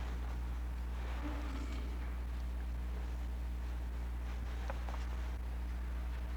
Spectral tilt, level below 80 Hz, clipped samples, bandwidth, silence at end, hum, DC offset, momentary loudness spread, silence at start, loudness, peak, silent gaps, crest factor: -6.5 dB/octave; -40 dBFS; under 0.1%; 9.4 kHz; 0 s; 60 Hz at -40 dBFS; under 0.1%; 1 LU; 0 s; -43 LUFS; -28 dBFS; none; 12 dB